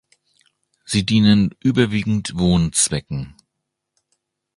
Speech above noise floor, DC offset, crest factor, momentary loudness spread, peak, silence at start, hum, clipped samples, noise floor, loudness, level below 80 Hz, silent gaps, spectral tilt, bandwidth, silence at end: 61 dB; under 0.1%; 18 dB; 13 LU; -2 dBFS; 0.9 s; none; under 0.1%; -79 dBFS; -18 LUFS; -40 dBFS; none; -4.5 dB/octave; 11.5 kHz; 1.25 s